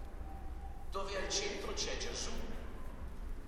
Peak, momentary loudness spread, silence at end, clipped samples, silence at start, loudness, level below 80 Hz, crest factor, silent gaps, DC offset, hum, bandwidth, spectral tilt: -22 dBFS; 13 LU; 0 s; under 0.1%; 0 s; -41 LUFS; -44 dBFS; 18 dB; none; under 0.1%; none; 13.5 kHz; -2.5 dB/octave